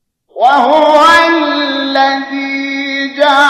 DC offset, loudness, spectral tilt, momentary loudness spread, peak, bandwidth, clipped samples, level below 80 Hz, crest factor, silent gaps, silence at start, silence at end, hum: under 0.1%; -10 LUFS; -2 dB/octave; 10 LU; 0 dBFS; 14 kHz; under 0.1%; -52 dBFS; 10 dB; none; 0.35 s; 0 s; none